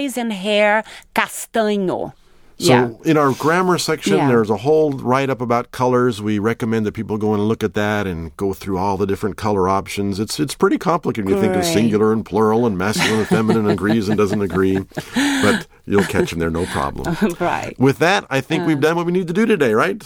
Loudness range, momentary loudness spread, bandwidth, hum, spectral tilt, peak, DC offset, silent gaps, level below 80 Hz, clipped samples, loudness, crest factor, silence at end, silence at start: 3 LU; 7 LU; 18.5 kHz; none; -5.5 dB/octave; -2 dBFS; under 0.1%; none; -44 dBFS; under 0.1%; -18 LUFS; 16 dB; 0 s; 0 s